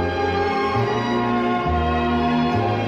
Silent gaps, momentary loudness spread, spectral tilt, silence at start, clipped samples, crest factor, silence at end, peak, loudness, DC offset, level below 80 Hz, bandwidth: none; 1 LU; -7 dB/octave; 0 s; under 0.1%; 12 dB; 0 s; -8 dBFS; -21 LUFS; under 0.1%; -34 dBFS; 8 kHz